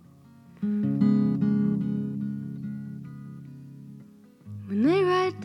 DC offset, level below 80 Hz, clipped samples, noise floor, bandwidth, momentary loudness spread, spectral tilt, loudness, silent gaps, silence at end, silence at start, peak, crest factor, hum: under 0.1%; -68 dBFS; under 0.1%; -52 dBFS; 6.2 kHz; 22 LU; -8.5 dB/octave; -26 LUFS; none; 0 s; 0.6 s; -12 dBFS; 16 dB; none